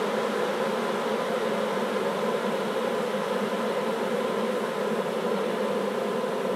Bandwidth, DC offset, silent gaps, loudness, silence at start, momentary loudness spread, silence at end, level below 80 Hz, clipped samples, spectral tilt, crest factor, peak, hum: 16 kHz; under 0.1%; none; -28 LUFS; 0 s; 1 LU; 0 s; -82 dBFS; under 0.1%; -5 dB/octave; 12 dB; -14 dBFS; none